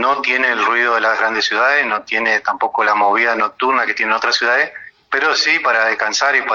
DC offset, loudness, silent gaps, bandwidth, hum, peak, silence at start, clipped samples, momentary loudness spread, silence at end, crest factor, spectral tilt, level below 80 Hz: under 0.1%; -15 LUFS; none; 7.4 kHz; none; -2 dBFS; 0 s; under 0.1%; 4 LU; 0 s; 14 dB; -0.5 dB/octave; -60 dBFS